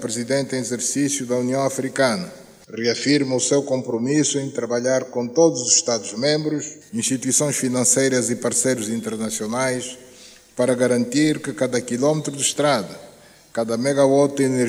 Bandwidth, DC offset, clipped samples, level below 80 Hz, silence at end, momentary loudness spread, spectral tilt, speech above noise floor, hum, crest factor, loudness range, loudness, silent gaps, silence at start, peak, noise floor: over 20 kHz; under 0.1%; under 0.1%; -66 dBFS; 0 s; 9 LU; -3.5 dB/octave; 25 dB; none; 18 dB; 3 LU; -20 LUFS; none; 0 s; -2 dBFS; -46 dBFS